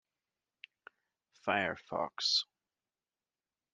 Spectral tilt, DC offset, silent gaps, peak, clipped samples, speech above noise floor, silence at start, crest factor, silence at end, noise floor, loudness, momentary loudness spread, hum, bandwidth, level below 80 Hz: -2 dB/octave; under 0.1%; none; -16 dBFS; under 0.1%; over 55 dB; 1.45 s; 24 dB; 1.3 s; under -90 dBFS; -34 LUFS; 20 LU; none; 11.5 kHz; -80 dBFS